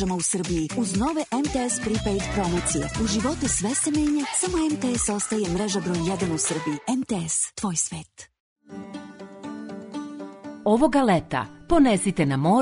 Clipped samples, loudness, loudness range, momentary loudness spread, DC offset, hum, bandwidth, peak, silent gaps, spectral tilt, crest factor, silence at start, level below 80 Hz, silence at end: under 0.1%; -24 LUFS; 5 LU; 17 LU; under 0.1%; none; 11 kHz; -6 dBFS; 8.40-8.56 s; -4.5 dB/octave; 18 dB; 0 s; -42 dBFS; 0 s